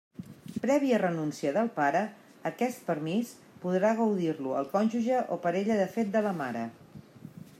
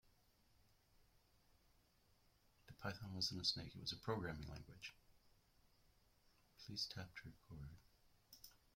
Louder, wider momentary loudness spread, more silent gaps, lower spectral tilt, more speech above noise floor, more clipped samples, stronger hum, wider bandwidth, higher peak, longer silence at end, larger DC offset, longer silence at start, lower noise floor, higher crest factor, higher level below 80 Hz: first, -29 LUFS vs -47 LUFS; second, 14 LU vs 20 LU; neither; first, -6.5 dB/octave vs -4 dB/octave; second, 20 dB vs 27 dB; neither; neither; about the same, 15 kHz vs 16.5 kHz; first, -14 dBFS vs -28 dBFS; about the same, 0.15 s vs 0.25 s; neither; first, 0.2 s vs 0.05 s; second, -49 dBFS vs -76 dBFS; second, 16 dB vs 24 dB; second, -78 dBFS vs -70 dBFS